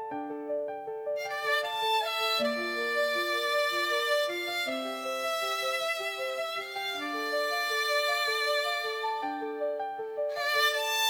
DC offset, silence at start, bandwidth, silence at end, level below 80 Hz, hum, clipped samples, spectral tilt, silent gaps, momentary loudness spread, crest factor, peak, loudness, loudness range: under 0.1%; 0 s; 19.5 kHz; 0 s; -80 dBFS; none; under 0.1%; -0.5 dB/octave; none; 8 LU; 16 dB; -14 dBFS; -29 LUFS; 3 LU